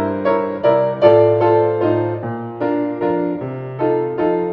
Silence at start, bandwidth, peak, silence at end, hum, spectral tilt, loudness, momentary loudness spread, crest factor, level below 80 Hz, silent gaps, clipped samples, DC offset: 0 s; 5.8 kHz; 0 dBFS; 0 s; none; -10 dB/octave; -17 LUFS; 10 LU; 16 dB; -58 dBFS; none; under 0.1%; under 0.1%